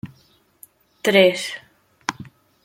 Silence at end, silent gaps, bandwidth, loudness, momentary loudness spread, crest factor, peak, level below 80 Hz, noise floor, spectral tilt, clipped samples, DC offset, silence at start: 0.4 s; none; 16.5 kHz; -20 LUFS; 24 LU; 22 dB; -2 dBFS; -66 dBFS; -58 dBFS; -4 dB/octave; under 0.1%; under 0.1%; 0.05 s